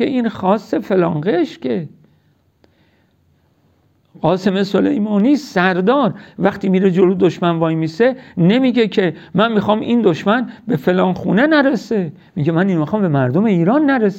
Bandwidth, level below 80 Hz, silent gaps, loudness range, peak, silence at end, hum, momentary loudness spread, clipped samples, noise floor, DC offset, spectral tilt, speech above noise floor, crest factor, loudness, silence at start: 8 kHz; -56 dBFS; none; 7 LU; -2 dBFS; 0 s; none; 6 LU; under 0.1%; -57 dBFS; under 0.1%; -7.5 dB/octave; 42 dB; 14 dB; -16 LUFS; 0 s